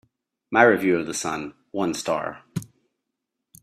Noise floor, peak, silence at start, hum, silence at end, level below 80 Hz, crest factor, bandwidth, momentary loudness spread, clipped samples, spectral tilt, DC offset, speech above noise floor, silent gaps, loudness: -82 dBFS; -2 dBFS; 0.5 s; none; 0.95 s; -64 dBFS; 24 dB; 15 kHz; 17 LU; under 0.1%; -4.5 dB/octave; under 0.1%; 60 dB; none; -23 LUFS